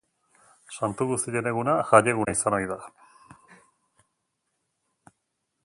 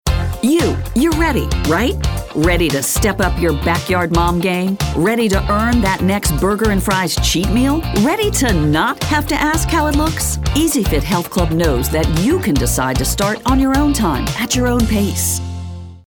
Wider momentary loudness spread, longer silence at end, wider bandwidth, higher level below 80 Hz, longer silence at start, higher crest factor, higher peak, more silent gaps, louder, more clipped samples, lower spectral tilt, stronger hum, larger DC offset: first, 14 LU vs 3 LU; first, 2.75 s vs 0.1 s; second, 11.5 kHz vs over 20 kHz; second, -60 dBFS vs -24 dBFS; first, 0.7 s vs 0.05 s; first, 28 dB vs 14 dB; about the same, -2 dBFS vs -2 dBFS; neither; second, -24 LUFS vs -16 LUFS; neither; about the same, -5 dB/octave vs -4.5 dB/octave; neither; neither